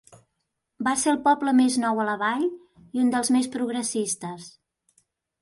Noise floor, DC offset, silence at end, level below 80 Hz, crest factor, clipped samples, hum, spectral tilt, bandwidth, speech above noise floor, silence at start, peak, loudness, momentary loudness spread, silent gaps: -79 dBFS; under 0.1%; 0.9 s; -68 dBFS; 16 dB; under 0.1%; none; -3 dB/octave; 11.5 kHz; 56 dB; 0.8 s; -10 dBFS; -24 LUFS; 10 LU; none